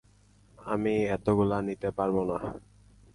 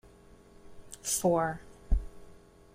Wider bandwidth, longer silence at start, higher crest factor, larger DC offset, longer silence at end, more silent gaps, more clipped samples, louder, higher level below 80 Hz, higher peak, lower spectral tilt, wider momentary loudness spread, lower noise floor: second, 11.5 kHz vs 16 kHz; about the same, 0.6 s vs 0.65 s; about the same, 16 dB vs 20 dB; neither; first, 0.55 s vs 0.4 s; neither; neither; about the same, -29 LUFS vs -31 LUFS; second, -54 dBFS vs -38 dBFS; about the same, -14 dBFS vs -14 dBFS; first, -8 dB/octave vs -4.5 dB/octave; second, 13 LU vs 21 LU; first, -60 dBFS vs -56 dBFS